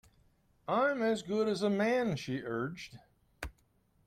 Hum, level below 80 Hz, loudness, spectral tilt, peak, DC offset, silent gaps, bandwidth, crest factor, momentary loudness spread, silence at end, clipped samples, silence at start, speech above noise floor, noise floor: none; -60 dBFS; -33 LUFS; -6 dB/octave; -18 dBFS; under 0.1%; none; 15 kHz; 16 dB; 17 LU; 0.55 s; under 0.1%; 0.7 s; 38 dB; -71 dBFS